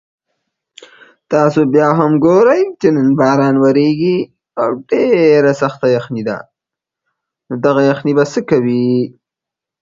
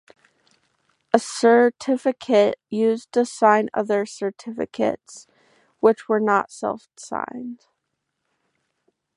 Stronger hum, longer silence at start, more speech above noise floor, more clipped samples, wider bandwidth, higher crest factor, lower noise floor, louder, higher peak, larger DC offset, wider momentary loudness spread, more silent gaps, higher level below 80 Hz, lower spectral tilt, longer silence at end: neither; first, 1.3 s vs 1.15 s; first, 73 dB vs 57 dB; neither; second, 7.6 kHz vs 11.5 kHz; second, 14 dB vs 22 dB; first, -84 dBFS vs -78 dBFS; first, -13 LUFS vs -21 LUFS; about the same, 0 dBFS vs 0 dBFS; neither; second, 9 LU vs 13 LU; neither; first, -56 dBFS vs -70 dBFS; first, -7.5 dB/octave vs -4.5 dB/octave; second, 0.75 s vs 1.6 s